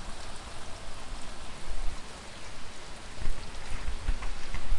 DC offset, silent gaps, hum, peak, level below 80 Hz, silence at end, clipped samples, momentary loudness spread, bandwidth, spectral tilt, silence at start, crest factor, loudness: under 0.1%; none; none; -12 dBFS; -36 dBFS; 0 s; under 0.1%; 7 LU; 11 kHz; -3.5 dB/octave; 0 s; 14 dB; -42 LUFS